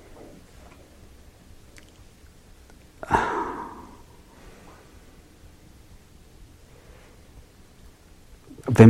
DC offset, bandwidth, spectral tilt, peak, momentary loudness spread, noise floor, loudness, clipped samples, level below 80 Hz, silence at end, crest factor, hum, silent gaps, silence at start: under 0.1%; 13 kHz; -8 dB/octave; 0 dBFS; 26 LU; -50 dBFS; -28 LUFS; under 0.1%; -50 dBFS; 0 s; 26 dB; none; none; 3.1 s